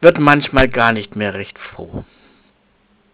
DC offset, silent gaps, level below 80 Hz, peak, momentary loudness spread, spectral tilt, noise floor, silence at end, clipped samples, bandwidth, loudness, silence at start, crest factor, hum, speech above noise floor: under 0.1%; none; -36 dBFS; 0 dBFS; 20 LU; -10 dB/octave; -57 dBFS; 1.1 s; 0.3%; 4 kHz; -14 LUFS; 0 s; 16 dB; none; 42 dB